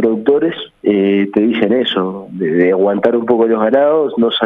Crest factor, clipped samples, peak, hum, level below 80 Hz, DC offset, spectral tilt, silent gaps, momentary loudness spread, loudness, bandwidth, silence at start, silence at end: 14 dB; under 0.1%; 0 dBFS; none; -58 dBFS; under 0.1%; -8.5 dB/octave; none; 7 LU; -14 LUFS; 4 kHz; 0 s; 0 s